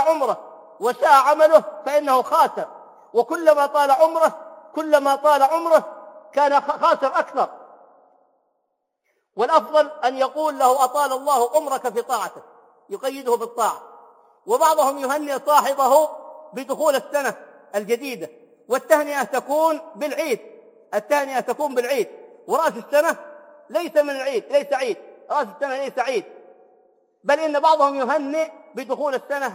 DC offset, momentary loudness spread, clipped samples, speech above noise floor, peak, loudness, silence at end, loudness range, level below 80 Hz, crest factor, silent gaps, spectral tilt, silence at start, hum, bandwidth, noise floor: under 0.1%; 13 LU; under 0.1%; 55 dB; -2 dBFS; -20 LUFS; 0 s; 6 LU; -82 dBFS; 20 dB; none; -2.5 dB/octave; 0 s; none; 16.5 kHz; -74 dBFS